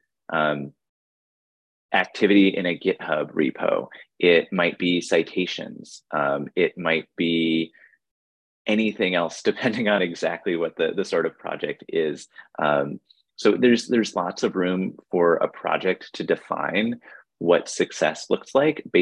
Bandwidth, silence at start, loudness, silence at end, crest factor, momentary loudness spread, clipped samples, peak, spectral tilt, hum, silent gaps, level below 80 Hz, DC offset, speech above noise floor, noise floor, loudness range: 10.5 kHz; 0.3 s; -23 LUFS; 0 s; 20 dB; 10 LU; under 0.1%; -4 dBFS; -5 dB/octave; none; 0.89-1.89 s, 8.11-8.65 s; -68 dBFS; under 0.1%; over 67 dB; under -90 dBFS; 3 LU